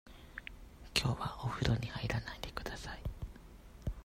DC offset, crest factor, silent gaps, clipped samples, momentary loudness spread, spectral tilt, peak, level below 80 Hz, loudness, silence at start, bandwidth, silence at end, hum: under 0.1%; 26 dB; none; under 0.1%; 17 LU; -4.5 dB/octave; -12 dBFS; -48 dBFS; -39 LUFS; 0.05 s; 16 kHz; 0 s; none